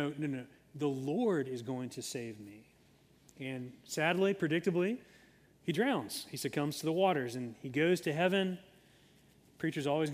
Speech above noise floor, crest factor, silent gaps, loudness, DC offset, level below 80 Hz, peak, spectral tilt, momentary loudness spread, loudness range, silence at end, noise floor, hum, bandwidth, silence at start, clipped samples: 31 dB; 20 dB; none; -35 LUFS; under 0.1%; -76 dBFS; -16 dBFS; -5.5 dB/octave; 13 LU; 5 LU; 0 s; -65 dBFS; none; 15.5 kHz; 0 s; under 0.1%